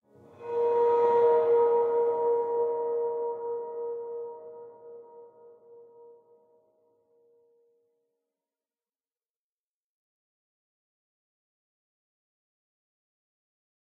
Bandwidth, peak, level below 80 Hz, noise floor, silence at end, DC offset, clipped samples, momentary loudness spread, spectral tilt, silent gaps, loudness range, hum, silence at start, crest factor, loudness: 4 kHz; -14 dBFS; -88 dBFS; under -90 dBFS; 8.2 s; under 0.1%; under 0.1%; 24 LU; -7 dB/octave; none; 18 LU; none; 0.4 s; 18 dB; -27 LUFS